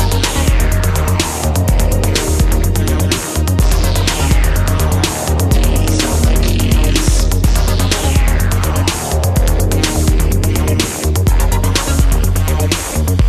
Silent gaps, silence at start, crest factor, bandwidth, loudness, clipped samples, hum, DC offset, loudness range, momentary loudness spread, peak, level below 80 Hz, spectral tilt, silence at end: none; 0 s; 12 dB; 14 kHz; -14 LUFS; under 0.1%; none; under 0.1%; 1 LU; 2 LU; 0 dBFS; -14 dBFS; -4.5 dB/octave; 0 s